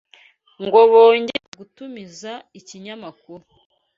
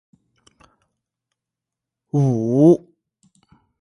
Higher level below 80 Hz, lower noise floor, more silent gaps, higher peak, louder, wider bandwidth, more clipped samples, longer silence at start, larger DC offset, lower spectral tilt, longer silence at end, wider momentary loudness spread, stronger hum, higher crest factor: about the same, -68 dBFS vs -64 dBFS; second, -53 dBFS vs -85 dBFS; first, 1.48-1.52 s vs none; about the same, -2 dBFS vs -2 dBFS; first, -14 LUFS vs -17 LUFS; second, 7.4 kHz vs 11 kHz; neither; second, 0.6 s vs 2.15 s; neither; second, -4 dB/octave vs -10.5 dB/octave; second, 0.6 s vs 1.05 s; first, 26 LU vs 7 LU; neither; about the same, 18 dB vs 20 dB